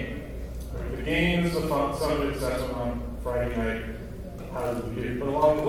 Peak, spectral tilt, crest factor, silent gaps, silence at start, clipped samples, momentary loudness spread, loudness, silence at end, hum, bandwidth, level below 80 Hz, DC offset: -10 dBFS; -6 dB/octave; 18 dB; none; 0 s; under 0.1%; 13 LU; -29 LUFS; 0 s; none; 17.5 kHz; -38 dBFS; 0.1%